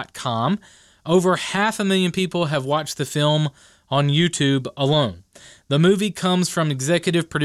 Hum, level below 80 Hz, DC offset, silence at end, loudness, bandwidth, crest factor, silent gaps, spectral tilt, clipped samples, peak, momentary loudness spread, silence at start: none; -58 dBFS; under 0.1%; 0 s; -20 LUFS; 14.5 kHz; 14 dB; none; -5 dB/octave; under 0.1%; -6 dBFS; 6 LU; 0 s